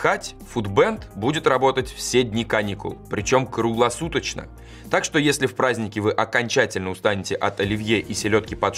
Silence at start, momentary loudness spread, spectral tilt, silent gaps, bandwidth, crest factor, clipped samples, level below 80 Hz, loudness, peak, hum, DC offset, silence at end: 0 s; 9 LU; -4.5 dB/octave; none; 15.5 kHz; 18 dB; under 0.1%; -46 dBFS; -22 LUFS; -4 dBFS; none; under 0.1%; 0 s